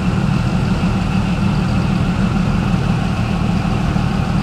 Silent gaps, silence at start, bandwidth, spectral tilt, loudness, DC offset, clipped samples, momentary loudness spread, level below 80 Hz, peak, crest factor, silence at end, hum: none; 0 s; 12 kHz; -7 dB/octave; -17 LUFS; under 0.1%; under 0.1%; 1 LU; -26 dBFS; -4 dBFS; 12 dB; 0 s; none